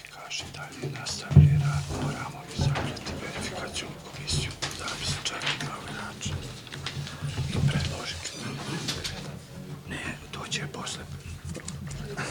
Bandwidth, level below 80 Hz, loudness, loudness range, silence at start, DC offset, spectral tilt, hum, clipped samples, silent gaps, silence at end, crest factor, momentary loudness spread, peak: 18.5 kHz; -44 dBFS; -30 LUFS; 8 LU; 0 s; under 0.1%; -4.5 dB/octave; none; under 0.1%; none; 0 s; 26 dB; 11 LU; -4 dBFS